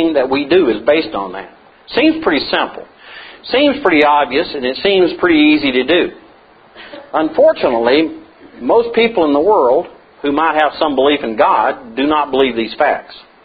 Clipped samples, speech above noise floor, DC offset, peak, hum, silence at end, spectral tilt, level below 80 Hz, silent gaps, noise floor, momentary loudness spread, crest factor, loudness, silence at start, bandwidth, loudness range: under 0.1%; 31 dB; under 0.1%; 0 dBFS; none; 0.25 s; -7.5 dB/octave; -48 dBFS; none; -44 dBFS; 12 LU; 14 dB; -13 LUFS; 0 s; 5 kHz; 3 LU